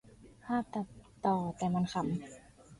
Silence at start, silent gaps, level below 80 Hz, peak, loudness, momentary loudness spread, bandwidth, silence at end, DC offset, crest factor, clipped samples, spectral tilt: 0.2 s; none; -62 dBFS; -18 dBFS; -35 LUFS; 18 LU; 11.5 kHz; 0.05 s; under 0.1%; 18 dB; under 0.1%; -7 dB/octave